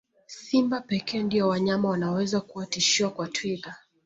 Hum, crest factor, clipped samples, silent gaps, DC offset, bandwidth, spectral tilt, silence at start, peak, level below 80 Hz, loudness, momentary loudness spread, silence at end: none; 16 dB; under 0.1%; none; under 0.1%; 8 kHz; -4 dB/octave; 0.3 s; -10 dBFS; -66 dBFS; -26 LUFS; 12 LU; 0.3 s